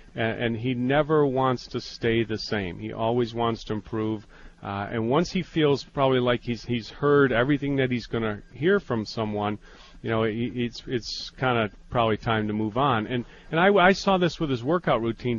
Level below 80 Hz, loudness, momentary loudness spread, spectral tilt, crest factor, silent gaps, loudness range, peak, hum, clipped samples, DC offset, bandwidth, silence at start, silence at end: -48 dBFS; -25 LUFS; 10 LU; -6.5 dB/octave; 20 dB; none; 5 LU; -4 dBFS; none; under 0.1%; under 0.1%; 7.4 kHz; 0 s; 0 s